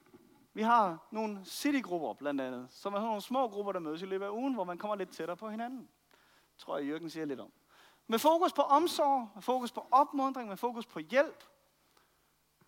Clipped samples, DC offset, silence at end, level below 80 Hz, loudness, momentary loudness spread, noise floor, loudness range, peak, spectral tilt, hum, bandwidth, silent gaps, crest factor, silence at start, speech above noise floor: under 0.1%; under 0.1%; 1.35 s; -84 dBFS; -33 LUFS; 13 LU; -73 dBFS; 9 LU; -14 dBFS; -4.5 dB/octave; none; 17 kHz; none; 20 dB; 0.55 s; 40 dB